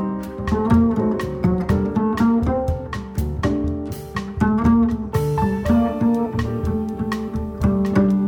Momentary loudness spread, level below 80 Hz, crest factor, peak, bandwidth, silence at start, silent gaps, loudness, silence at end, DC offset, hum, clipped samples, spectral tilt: 10 LU; -32 dBFS; 14 dB; -6 dBFS; 18 kHz; 0 s; none; -20 LUFS; 0 s; under 0.1%; none; under 0.1%; -8.5 dB/octave